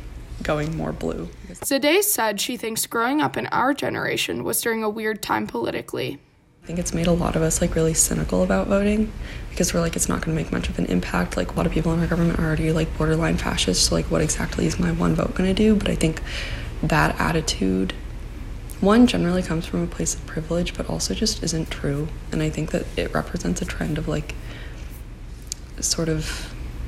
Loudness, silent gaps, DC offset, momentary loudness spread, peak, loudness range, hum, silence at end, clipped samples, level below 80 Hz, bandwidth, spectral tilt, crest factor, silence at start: -23 LUFS; none; under 0.1%; 13 LU; -4 dBFS; 5 LU; none; 0 s; under 0.1%; -34 dBFS; 16 kHz; -4.5 dB/octave; 18 dB; 0 s